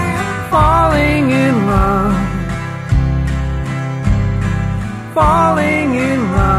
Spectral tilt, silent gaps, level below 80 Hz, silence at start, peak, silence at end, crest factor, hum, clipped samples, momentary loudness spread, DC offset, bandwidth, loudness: -7 dB/octave; none; -22 dBFS; 0 s; 0 dBFS; 0 s; 12 dB; none; under 0.1%; 9 LU; under 0.1%; 13.5 kHz; -15 LUFS